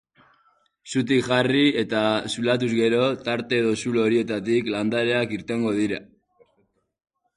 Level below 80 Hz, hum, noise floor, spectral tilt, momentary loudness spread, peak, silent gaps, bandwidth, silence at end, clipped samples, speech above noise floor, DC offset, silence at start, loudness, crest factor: -62 dBFS; none; -69 dBFS; -5.5 dB/octave; 6 LU; -6 dBFS; none; 11.5 kHz; 1.35 s; under 0.1%; 46 dB; under 0.1%; 0.85 s; -23 LUFS; 18 dB